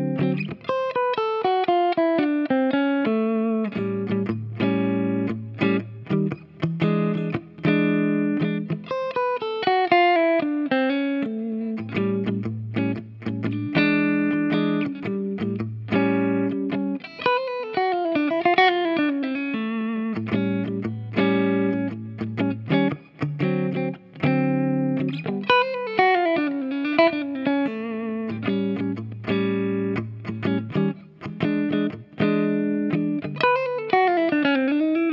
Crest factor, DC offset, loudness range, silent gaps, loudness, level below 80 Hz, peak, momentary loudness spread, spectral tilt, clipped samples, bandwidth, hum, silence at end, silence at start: 20 dB; under 0.1%; 3 LU; none; -23 LUFS; -64 dBFS; -2 dBFS; 8 LU; -9 dB/octave; under 0.1%; 6 kHz; none; 0 s; 0 s